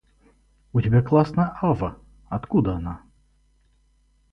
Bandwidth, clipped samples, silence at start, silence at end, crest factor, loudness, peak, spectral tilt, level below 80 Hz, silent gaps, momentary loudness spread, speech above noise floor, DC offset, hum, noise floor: 6 kHz; under 0.1%; 0.75 s; 1.35 s; 18 dB; -23 LUFS; -6 dBFS; -10.5 dB/octave; -44 dBFS; none; 14 LU; 41 dB; under 0.1%; none; -62 dBFS